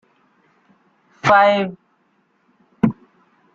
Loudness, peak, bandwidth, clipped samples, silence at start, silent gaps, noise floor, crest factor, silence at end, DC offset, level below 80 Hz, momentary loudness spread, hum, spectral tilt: -17 LUFS; -2 dBFS; 7.8 kHz; under 0.1%; 1.25 s; none; -63 dBFS; 20 dB; 0.6 s; under 0.1%; -58 dBFS; 14 LU; none; -6 dB/octave